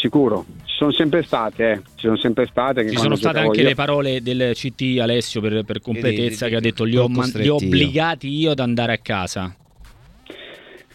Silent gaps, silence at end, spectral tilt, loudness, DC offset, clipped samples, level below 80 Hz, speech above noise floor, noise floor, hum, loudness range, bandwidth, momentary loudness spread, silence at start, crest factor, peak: none; 0.15 s; -6 dB/octave; -19 LUFS; under 0.1%; under 0.1%; -48 dBFS; 26 dB; -45 dBFS; none; 2 LU; 14.5 kHz; 8 LU; 0 s; 18 dB; -2 dBFS